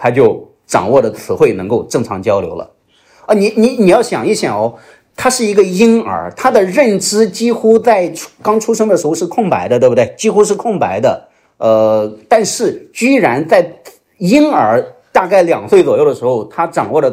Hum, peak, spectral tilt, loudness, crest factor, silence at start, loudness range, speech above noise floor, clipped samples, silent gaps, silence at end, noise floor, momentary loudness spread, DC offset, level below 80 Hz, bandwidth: none; 0 dBFS; -5 dB/octave; -12 LUFS; 12 dB; 0 s; 2 LU; 35 dB; 0.3%; none; 0 s; -47 dBFS; 7 LU; under 0.1%; -52 dBFS; 16 kHz